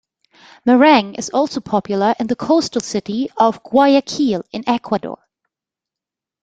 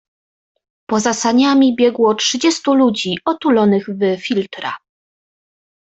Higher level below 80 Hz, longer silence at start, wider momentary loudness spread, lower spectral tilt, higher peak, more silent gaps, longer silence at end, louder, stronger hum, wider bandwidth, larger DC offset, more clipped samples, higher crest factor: about the same, -58 dBFS vs -60 dBFS; second, 0.65 s vs 0.9 s; first, 11 LU vs 8 LU; about the same, -4.5 dB/octave vs -4 dB/octave; about the same, -2 dBFS vs -2 dBFS; neither; first, 1.3 s vs 1.05 s; about the same, -17 LUFS vs -15 LUFS; neither; first, 9.2 kHz vs 8.2 kHz; neither; neither; about the same, 16 dB vs 14 dB